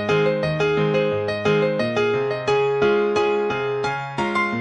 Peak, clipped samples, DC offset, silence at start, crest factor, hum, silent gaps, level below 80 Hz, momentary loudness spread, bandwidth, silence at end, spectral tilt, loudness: -8 dBFS; under 0.1%; under 0.1%; 0 s; 14 dB; none; none; -52 dBFS; 4 LU; 8.8 kHz; 0 s; -6 dB/octave; -21 LUFS